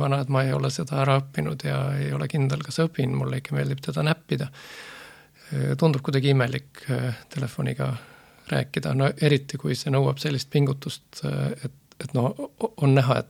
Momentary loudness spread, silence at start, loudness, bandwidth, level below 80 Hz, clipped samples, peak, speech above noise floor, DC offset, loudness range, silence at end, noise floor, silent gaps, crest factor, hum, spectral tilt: 11 LU; 0 s; -25 LUFS; 14.5 kHz; -58 dBFS; under 0.1%; -4 dBFS; 24 dB; under 0.1%; 2 LU; 0.05 s; -48 dBFS; none; 20 dB; none; -6.5 dB/octave